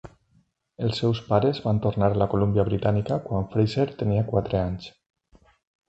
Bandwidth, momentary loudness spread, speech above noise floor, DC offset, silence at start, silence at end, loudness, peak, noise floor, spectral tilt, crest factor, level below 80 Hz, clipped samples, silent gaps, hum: 8 kHz; 6 LU; 42 dB; under 0.1%; 0.05 s; 1 s; -24 LUFS; -6 dBFS; -65 dBFS; -8.5 dB/octave; 20 dB; -46 dBFS; under 0.1%; none; none